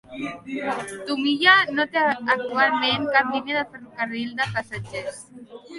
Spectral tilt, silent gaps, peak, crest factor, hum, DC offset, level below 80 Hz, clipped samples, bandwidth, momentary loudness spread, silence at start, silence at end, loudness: -4 dB/octave; none; -2 dBFS; 20 dB; none; under 0.1%; -62 dBFS; under 0.1%; 11.5 kHz; 17 LU; 0.1 s; 0 s; -22 LUFS